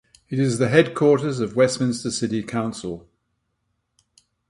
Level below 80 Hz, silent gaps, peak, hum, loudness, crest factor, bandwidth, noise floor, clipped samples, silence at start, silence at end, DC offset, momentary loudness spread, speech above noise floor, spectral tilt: -58 dBFS; none; 0 dBFS; none; -21 LUFS; 22 dB; 11.5 kHz; -74 dBFS; under 0.1%; 0.3 s; 1.5 s; under 0.1%; 12 LU; 53 dB; -5.5 dB/octave